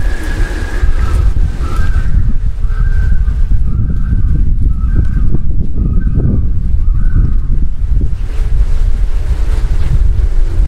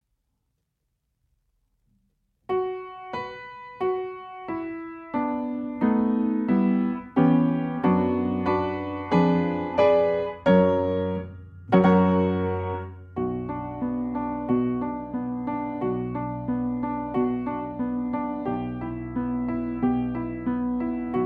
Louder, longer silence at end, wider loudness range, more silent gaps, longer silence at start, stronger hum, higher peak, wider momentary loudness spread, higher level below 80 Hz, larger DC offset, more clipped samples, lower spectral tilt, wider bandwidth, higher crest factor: first, -16 LUFS vs -25 LUFS; about the same, 0 s vs 0 s; second, 1 LU vs 10 LU; neither; second, 0 s vs 2.5 s; neither; first, 0 dBFS vs -6 dBFS; second, 4 LU vs 13 LU; first, -10 dBFS vs -52 dBFS; neither; neither; second, -7.5 dB/octave vs -10 dB/octave; first, 5.8 kHz vs 4.9 kHz; second, 8 dB vs 20 dB